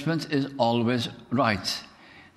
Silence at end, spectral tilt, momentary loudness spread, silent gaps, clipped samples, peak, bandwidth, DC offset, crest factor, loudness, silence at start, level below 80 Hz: 0.15 s; -5.5 dB/octave; 6 LU; none; under 0.1%; -8 dBFS; 16 kHz; under 0.1%; 20 dB; -26 LUFS; 0 s; -60 dBFS